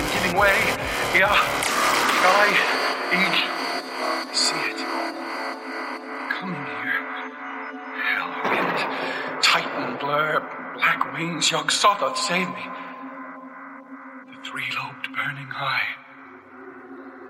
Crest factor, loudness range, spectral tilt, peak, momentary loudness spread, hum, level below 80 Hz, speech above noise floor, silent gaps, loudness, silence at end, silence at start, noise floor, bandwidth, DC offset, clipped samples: 22 dB; 10 LU; -2 dB/octave; -4 dBFS; 19 LU; none; -52 dBFS; 23 dB; none; -22 LUFS; 0 s; 0 s; -44 dBFS; 16.5 kHz; under 0.1%; under 0.1%